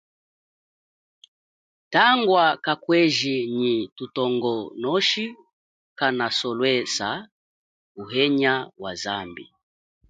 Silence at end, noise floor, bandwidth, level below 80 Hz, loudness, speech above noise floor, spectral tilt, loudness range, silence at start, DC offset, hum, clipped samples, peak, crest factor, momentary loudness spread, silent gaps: 0.65 s; under -90 dBFS; 9.4 kHz; -68 dBFS; -22 LUFS; over 67 dB; -4 dB/octave; 4 LU; 1.9 s; under 0.1%; none; under 0.1%; -4 dBFS; 22 dB; 13 LU; 3.92-3.96 s, 5.53-5.96 s, 7.32-7.95 s